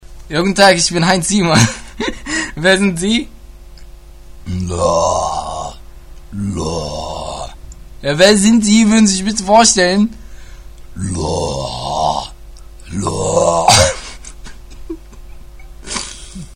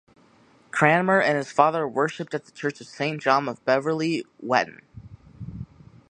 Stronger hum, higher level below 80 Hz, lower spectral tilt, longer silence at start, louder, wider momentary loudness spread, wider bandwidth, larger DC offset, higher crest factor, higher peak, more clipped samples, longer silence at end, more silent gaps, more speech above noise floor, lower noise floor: neither; first, -34 dBFS vs -58 dBFS; second, -3.5 dB/octave vs -5.5 dB/octave; second, 0.1 s vs 0.75 s; first, -14 LUFS vs -23 LUFS; first, 22 LU vs 19 LU; first, 16 kHz vs 10.5 kHz; neither; second, 16 dB vs 24 dB; about the same, 0 dBFS vs -2 dBFS; neither; second, 0 s vs 0.5 s; neither; second, 22 dB vs 34 dB; second, -35 dBFS vs -57 dBFS